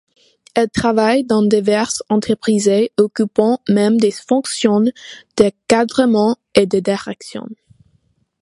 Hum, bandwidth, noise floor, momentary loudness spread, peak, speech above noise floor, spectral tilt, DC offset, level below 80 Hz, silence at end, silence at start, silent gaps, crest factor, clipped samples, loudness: none; 11.5 kHz; -61 dBFS; 9 LU; 0 dBFS; 46 dB; -5 dB/octave; under 0.1%; -52 dBFS; 0.9 s; 0.55 s; none; 16 dB; under 0.1%; -16 LUFS